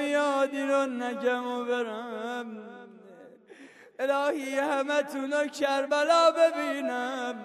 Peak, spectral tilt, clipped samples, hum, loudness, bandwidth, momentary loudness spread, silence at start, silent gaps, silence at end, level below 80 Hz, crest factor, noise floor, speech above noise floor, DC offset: -10 dBFS; -2.5 dB/octave; under 0.1%; none; -27 LUFS; 13.5 kHz; 13 LU; 0 s; none; 0 s; -84 dBFS; 18 dB; -51 dBFS; 24 dB; under 0.1%